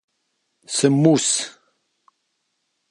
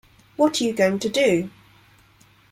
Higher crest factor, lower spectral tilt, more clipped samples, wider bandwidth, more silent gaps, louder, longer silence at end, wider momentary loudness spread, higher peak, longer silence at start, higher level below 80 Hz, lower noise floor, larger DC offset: about the same, 20 dB vs 18 dB; about the same, -4.5 dB/octave vs -4.5 dB/octave; neither; second, 11.5 kHz vs 16 kHz; neither; first, -18 LUFS vs -21 LUFS; first, 1.4 s vs 1.05 s; about the same, 10 LU vs 12 LU; first, -2 dBFS vs -6 dBFS; first, 0.7 s vs 0.4 s; second, -72 dBFS vs -62 dBFS; first, -73 dBFS vs -55 dBFS; neither